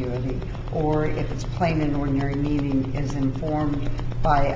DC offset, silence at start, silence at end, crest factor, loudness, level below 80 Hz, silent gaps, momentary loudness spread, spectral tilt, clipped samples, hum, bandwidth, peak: under 0.1%; 0 s; 0 s; 16 dB; -25 LUFS; -32 dBFS; none; 7 LU; -8 dB/octave; under 0.1%; none; 7.6 kHz; -6 dBFS